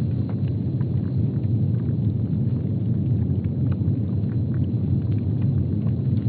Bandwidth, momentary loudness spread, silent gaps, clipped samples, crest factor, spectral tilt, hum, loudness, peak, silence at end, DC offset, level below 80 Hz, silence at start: 4.3 kHz; 2 LU; none; under 0.1%; 12 dB; -12 dB/octave; none; -24 LUFS; -10 dBFS; 0 s; under 0.1%; -42 dBFS; 0 s